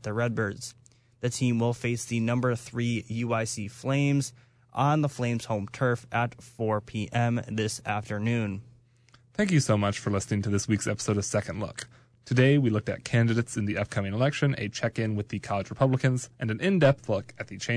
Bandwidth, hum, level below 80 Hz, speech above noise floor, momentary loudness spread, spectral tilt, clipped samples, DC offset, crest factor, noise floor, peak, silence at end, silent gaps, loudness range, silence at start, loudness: 11 kHz; none; -60 dBFS; 33 dB; 10 LU; -6 dB/octave; under 0.1%; under 0.1%; 16 dB; -60 dBFS; -10 dBFS; 0 s; none; 3 LU; 0 s; -28 LUFS